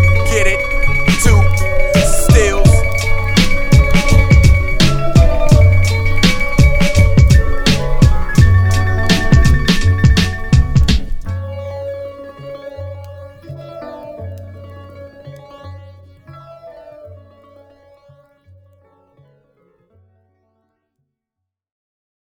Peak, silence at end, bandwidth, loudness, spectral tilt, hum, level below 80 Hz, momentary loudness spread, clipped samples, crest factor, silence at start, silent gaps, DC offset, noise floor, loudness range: 0 dBFS; 5.1 s; 16.5 kHz; -13 LUFS; -5.5 dB/octave; none; -16 dBFS; 21 LU; 0.1%; 12 dB; 0 s; none; under 0.1%; -81 dBFS; 20 LU